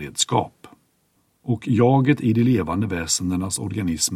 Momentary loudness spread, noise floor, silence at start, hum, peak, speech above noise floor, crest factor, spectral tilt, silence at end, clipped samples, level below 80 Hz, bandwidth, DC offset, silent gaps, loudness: 10 LU; -66 dBFS; 0 s; none; -4 dBFS; 45 dB; 18 dB; -5 dB/octave; 0 s; under 0.1%; -50 dBFS; 15.5 kHz; under 0.1%; none; -21 LUFS